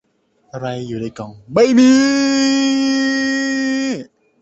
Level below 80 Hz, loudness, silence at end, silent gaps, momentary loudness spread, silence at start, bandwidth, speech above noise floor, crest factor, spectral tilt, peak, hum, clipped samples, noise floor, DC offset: -56 dBFS; -15 LUFS; 0.4 s; none; 17 LU; 0.55 s; 8 kHz; 45 dB; 14 dB; -4 dB/octave; -2 dBFS; none; under 0.1%; -59 dBFS; under 0.1%